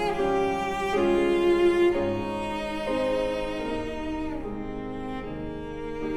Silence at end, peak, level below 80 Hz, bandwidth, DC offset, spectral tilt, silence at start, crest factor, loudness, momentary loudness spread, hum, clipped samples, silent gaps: 0 s; -12 dBFS; -42 dBFS; 12 kHz; under 0.1%; -6 dB/octave; 0 s; 14 dB; -27 LUFS; 13 LU; none; under 0.1%; none